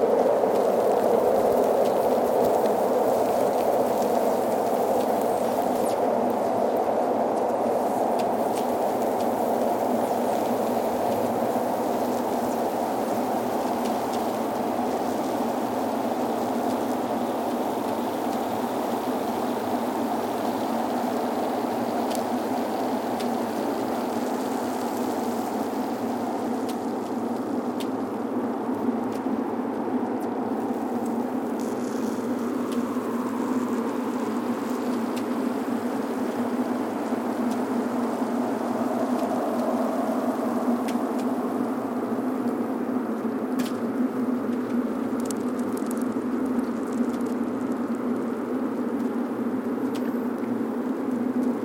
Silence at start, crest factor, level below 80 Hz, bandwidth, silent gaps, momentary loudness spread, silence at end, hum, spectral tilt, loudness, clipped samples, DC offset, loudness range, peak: 0 s; 16 dB; -64 dBFS; 17 kHz; none; 5 LU; 0 s; none; -5.5 dB/octave; -26 LUFS; under 0.1%; under 0.1%; 5 LU; -8 dBFS